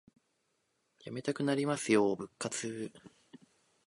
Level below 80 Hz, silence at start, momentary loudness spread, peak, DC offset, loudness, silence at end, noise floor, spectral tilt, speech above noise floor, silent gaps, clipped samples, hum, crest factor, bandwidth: -76 dBFS; 1.05 s; 16 LU; -14 dBFS; under 0.1%; -34 LUFS; 0.5 s; -79 dBFS; -4.5 dB/octave; 46 dB; none; under 0.1%; none; 22 dB; 11.5 kHz